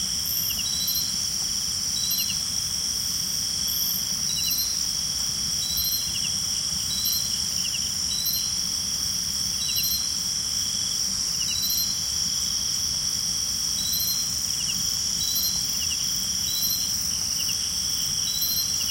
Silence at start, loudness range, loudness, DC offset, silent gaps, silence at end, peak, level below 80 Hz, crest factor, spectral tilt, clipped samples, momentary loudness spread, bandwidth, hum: 0 s; 1 LU; -23 LUFS; under 0.1%; none; 0 s; -10 dBFS; -48 dBFS; 16 dB; 0.5 dB/octave; under 0.1%; 2 LU; 16.5 kHz; none